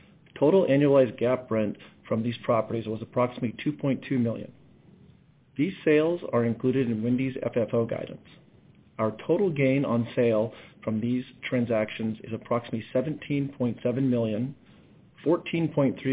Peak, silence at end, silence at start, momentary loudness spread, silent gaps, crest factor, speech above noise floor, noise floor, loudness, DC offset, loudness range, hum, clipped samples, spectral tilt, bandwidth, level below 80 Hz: -10 dBFS; 0 s; 0.35 s; 10 LU; none; 16 dB; 31 dB; -57 dBFS; -27 LUFS; under 0.1%; 3 LU; none; under 0.1%; -11.5 dB/octave; 4 kHz; -62 dBFS